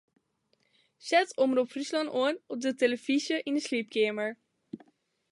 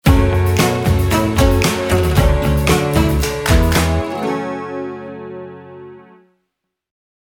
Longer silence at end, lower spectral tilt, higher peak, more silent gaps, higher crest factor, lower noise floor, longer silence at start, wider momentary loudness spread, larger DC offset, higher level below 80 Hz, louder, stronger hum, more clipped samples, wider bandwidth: second, 0.55 s vs 1.4 s; second, -3 dB/octave vs -5.5 dB/octave; second, -12 dBFS vs 0 dBFS; neither; about the same, 20 dB vs 16 dB; about the same, -74 dBFS vs -75 dBFS; first, 1.05 s vs 0.05 s; about the same, 18 LU vs 17 LU; neither; second, -84 dBFS vs -22 dBFS; second, -29 LUFS vs -16 LUFS; neither; neither; second, 11.5 kHz vs 19.5 kHz